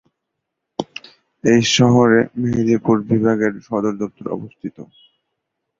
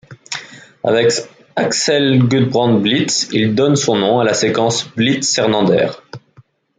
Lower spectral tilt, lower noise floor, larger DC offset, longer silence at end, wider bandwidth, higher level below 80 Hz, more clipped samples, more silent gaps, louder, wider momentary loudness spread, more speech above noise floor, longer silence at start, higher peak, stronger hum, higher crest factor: about the same, -5.5 dB/octave vs -4.5 dB/octave; first, -78 dBFS vs -49 dBFS; neither; first, 0.95 s vs 0.6 s; second, 7.6 kHz vs 9.6 kHz; first, -52 dBFS vs -58 dBFS; neither; neither; second, -17 LUFS vs -14 LUFS; first, 19 LU vs 10 LU; first, 61 dB vs 35 dB; first, 0.8 s vs 0.1 s; about the same, -2 dBFS vs -2 dBFS; neither; about the same, 18 dB vs 14 dB